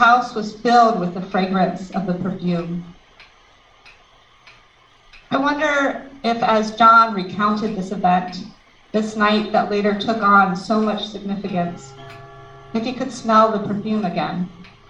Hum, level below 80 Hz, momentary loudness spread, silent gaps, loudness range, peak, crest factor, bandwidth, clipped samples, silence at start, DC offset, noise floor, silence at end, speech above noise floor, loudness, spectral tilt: none; -52 dBFS; 14 LU; none; 9 LU; -2 dBFS; 18 dB; 8.8 kHz; under 0.1%; 0 s; under 0.1%; -52 dBFS; 0.25 s; 33 dB; -19 LUFS; -6 dB/octave